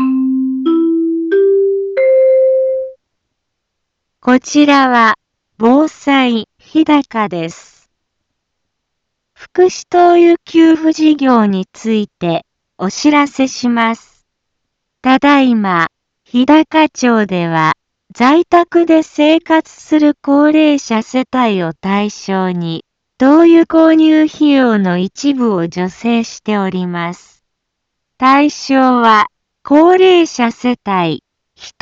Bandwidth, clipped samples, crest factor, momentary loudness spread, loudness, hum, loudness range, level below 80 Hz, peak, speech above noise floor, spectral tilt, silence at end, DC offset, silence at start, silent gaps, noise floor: 7.8 kHz; under 0.1%; 12 dB; 10 LU; -12 LUFS; none; 5 LU; -56 dBFS; 0 dBFS; 62 dB; -5.5 dB/octave; 0.1 s; under 0.1%; 0 s; none; -73 dBFS